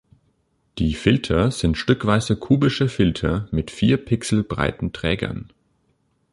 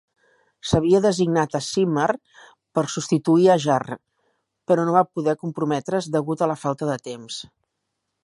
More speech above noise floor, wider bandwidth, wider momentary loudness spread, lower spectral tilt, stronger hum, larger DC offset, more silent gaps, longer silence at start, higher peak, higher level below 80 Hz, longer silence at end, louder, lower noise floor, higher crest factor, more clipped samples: second, 46 dB vs 57 dB; about the same, 11.5 kHz vs 11.5 kHz; second, 7 LU vs 15 LU; about the same, -6 dB/octave vs -6 dB/octave; neither; neither; neither; about the same, 0.75 s vs 0.65 s; about the same, -2 dBFS vs -4 dBFS; first, -36 dBFS vs -52 dBFS; about the same, 0.9 s vs 0.8 s; about the same, -21 LUFS vs -21 LUFS; second, -66 dBFS vs -78 dBFS; about the same, 18 dB vs 20 dB; neither